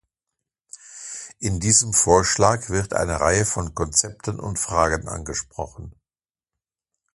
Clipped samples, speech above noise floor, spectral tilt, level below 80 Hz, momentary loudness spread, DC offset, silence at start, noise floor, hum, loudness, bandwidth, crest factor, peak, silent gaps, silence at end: under 0.1%; over 68 dB; -3.5 dB/octave; -40 dBFS; 17 LU; under 0.1%; 0.85 s; under -90 dBFS; none; -20 LUFS; 11.5 kHz; 22 dB; 0 dBFS; none; 1.25 s